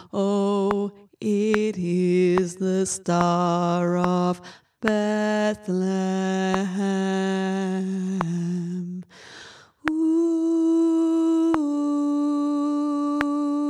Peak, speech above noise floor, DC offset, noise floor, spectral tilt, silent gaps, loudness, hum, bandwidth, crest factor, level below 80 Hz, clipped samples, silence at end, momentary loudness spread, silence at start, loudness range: -2 dBFS; 24 dB; under 0.1%; -46 dBFS; -6.5 dB/octave; none; -23 LUFS; none; 11.5 kHz; 22 dB; -60 dBFS; under 0.1%; 0 s; 8 LU; 0 s; 4 LU